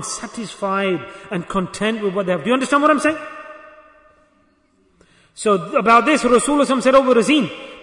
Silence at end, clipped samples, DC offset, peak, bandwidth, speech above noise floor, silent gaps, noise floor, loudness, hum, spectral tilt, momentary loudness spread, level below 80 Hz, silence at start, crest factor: 0 s; under 0.1%; under 0.1%; -2 dBFS; 11 kHz; 42 dB; none; -59 dBFS; -17 LUFS; none; -4.5 dB/octave; 15 LU; -52 dBFS; 0 s; 16 dB